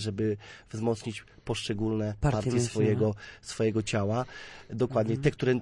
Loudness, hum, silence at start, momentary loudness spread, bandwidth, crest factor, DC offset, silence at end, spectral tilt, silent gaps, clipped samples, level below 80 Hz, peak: -30 LUFS; none; 0 s; 13 LU; 11.5 kHz; 16 dB; under 0.1%; 0 s; -6 dB/octave; none; under 0.1%; -50 dBFS; -12 dBFS